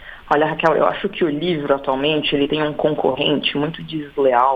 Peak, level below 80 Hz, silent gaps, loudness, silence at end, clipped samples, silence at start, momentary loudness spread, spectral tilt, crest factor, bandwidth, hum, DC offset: -2 dBFS; -48 dBFS; none; -19 LUFS; 0 s; under 0.1%; 0 s; 5 LU; -7 dB/octave; 18 dB; 7.4 kHz; none; under 0.1%